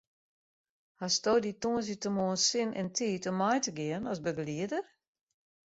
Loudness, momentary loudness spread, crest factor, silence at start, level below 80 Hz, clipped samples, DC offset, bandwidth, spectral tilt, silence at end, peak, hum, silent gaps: -32 LUFS; 8 LU; 18 dB; 1 s; -70 dBFS; under 0.1%; under 0.1%; 8 kHz; -3.5 dB/octave; 0.9 s; -16 dBFS; none; none